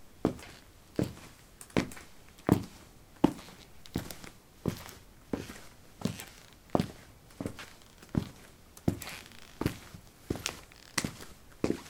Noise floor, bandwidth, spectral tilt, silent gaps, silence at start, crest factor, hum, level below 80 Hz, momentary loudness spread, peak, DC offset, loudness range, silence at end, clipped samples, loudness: -54 dBFS; 18 kHz; -5.5 dB/octave; none; 0 s; 30 dB; none; -54 dBFS; 22 LU; -8 dBFS; under 0.1%; 5 LU; 0 s; under 0.1%; -36 LUFS